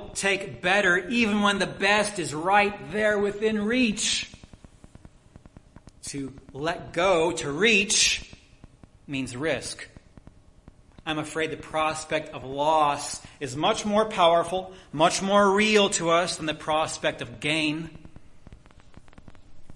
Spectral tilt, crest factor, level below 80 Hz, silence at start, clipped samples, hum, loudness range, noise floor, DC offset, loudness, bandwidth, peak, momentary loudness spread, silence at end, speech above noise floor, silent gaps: -3 dB/octave; 20 dB; -54 dBFS; 0 s; under 0.1%; none; 8 LU; -53 dBFS; under 0.1%; -24 LUFS; 11.5 kHz; -6 dBFS; 15 LU; 0 s; 28 dB; none